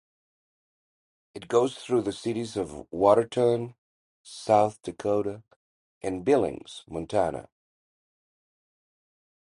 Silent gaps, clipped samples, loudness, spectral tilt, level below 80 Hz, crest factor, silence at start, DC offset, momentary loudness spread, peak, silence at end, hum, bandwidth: 3.78-4.24 s, 5.56-6.01 s; under 0.1%; -26 LUFS; -6 dB/octave; -60 dBFS; 22 dB; 1.35 s; under 0.1%; 18 LU; -6 dBFS; 2.15 s; none; 11.5 kHz